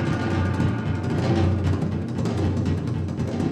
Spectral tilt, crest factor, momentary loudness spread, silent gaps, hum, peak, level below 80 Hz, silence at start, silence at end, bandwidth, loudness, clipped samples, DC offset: -8 dB/octave; 14 dB; 5 LU; none; none; -10 dBFS; -42 dBFS; 0 s; 0 s; 9.6 kHz; -24 LUFS; under 0.1%; under 0.1%